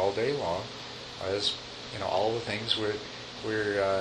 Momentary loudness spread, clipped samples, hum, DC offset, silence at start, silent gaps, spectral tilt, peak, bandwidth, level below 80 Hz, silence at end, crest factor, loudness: 11 LU; under 0.1%; none; under 0.1%; 0 s; none; -4 dB/octave; -10 dBFS; 10.5 kHz; -60 dBFS; 0 s; 20 dB; -31 LUFS